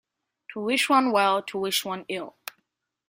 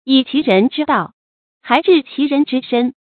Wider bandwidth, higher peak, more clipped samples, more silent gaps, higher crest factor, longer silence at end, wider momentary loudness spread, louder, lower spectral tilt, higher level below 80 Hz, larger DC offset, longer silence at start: first, 16 kHz vs 4.6 kHz; second, -6 dBFS vs 0 dBFS; neither; second, none vs 1.13-1.61 s; about the same, 20 dB vs 16 dB; first, 0.8 s vs 0.3 s; first, 19 LU vs 6 LU; second, -24 LUFS vs -15 LUFS; second, -3 dB/octave vs -7.5 dB/octave; second, -74 dBFS vs -62 dBFS; neither; first, 0.5 s vs 0.05 s